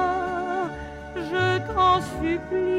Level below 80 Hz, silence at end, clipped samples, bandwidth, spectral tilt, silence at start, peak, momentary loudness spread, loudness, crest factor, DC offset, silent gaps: -44 dBFS; 0 s; under 0.1%; 13 kHz; -6 dB/octave; 0 s; -8 dBFS; 13 LU; -24 LUFS; 16 dB; under 0.1%; none